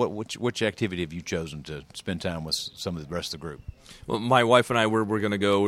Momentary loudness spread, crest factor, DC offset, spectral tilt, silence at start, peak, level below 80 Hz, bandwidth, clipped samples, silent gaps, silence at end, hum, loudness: 18 LU; 22 dB; under 0.1%; -5 dB/octave; 0 s; -4 dBFS; -52 dBFS; 16 kHz; under 0.1%; none; 0 s; none; -26 LUFS